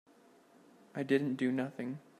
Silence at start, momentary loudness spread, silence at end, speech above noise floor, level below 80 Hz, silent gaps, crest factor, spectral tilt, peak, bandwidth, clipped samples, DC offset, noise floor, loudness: 0.95 s; 11 LU; 0.2 s; 29 dB; -84 dBFS; none; 20 dB; -7 dB/octave; -18 dBFS; 12.5 kHz; under 0.1%; under 0.1%; -63 dBFS; -35 LUFS